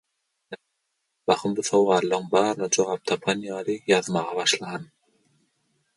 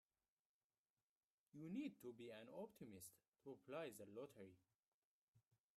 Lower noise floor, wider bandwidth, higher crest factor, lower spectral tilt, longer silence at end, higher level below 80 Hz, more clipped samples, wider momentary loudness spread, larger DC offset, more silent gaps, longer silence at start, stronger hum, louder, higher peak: second, -77 dBFS vs under -90 dBFS; second, 11.5 kHz vs 13.5 kHz; about the same, 20 dB vs 18 dB; second, -3.5 dB/octave vs -5.5 dB/octave; first, 1.15 s vs 0.35 s; first, -70 dBFS vs under -90 dBFS; neither; about the same, 15 LU vs 13 LU; neither; second, none vs 3.28-3.32 s, 4.75-4.79 s, 4.86-5.34 s; second, 0.5 s vs 1.55 s; neither; first, -24 LUFS vs -57 LUFS; first, -4 dBFS vs -40 dBFS